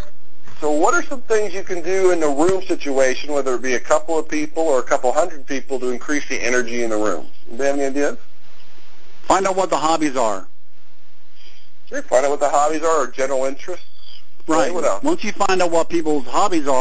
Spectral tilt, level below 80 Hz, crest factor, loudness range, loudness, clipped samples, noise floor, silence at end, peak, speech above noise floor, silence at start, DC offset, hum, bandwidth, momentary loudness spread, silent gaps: -4 dB/octave; -54 dBFS; 20 dB; 3 LU; -20 LUFS; under 0.1%; -57 dBFS; 0 s; 0 dBFS; 38 dB; 0 s; 10%; none; 8 kHz; 8 LU; none